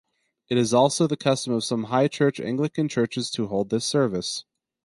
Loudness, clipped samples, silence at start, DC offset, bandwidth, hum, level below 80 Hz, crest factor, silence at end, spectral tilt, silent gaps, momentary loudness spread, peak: -24 LUFS; under 0.1%; 0.5 s; under 0.1%; 11.5 kHz; none; -62 dBFS; 18 dB; 0.45 s; -5 dB/octave; none; 7 LU; -6 dBFS